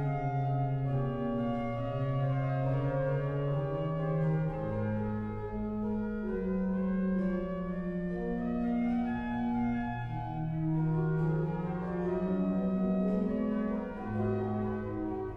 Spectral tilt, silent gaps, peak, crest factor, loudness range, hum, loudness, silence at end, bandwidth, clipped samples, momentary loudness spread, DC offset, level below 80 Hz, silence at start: -10.5 dB/octave; none; -20 dBFS; 12 dB; 2 LU; none; -33 LUFS; 0 s; 5.2 kHz; under 0.1%; 5 LU; under 0.1%; -48 dBFS; 0 s